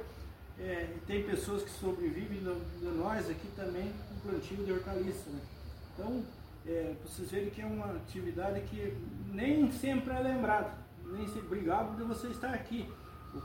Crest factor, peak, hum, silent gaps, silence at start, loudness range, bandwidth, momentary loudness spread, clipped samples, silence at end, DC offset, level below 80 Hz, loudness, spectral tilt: 18 dB; -18 dBFS; none; none; 0 s; 6 LU; 17 kHz; 13 LU; under 0.1%; 0 s; under 0.1%; -52 dBFS; -37 LUFS; -6.5 dB/octave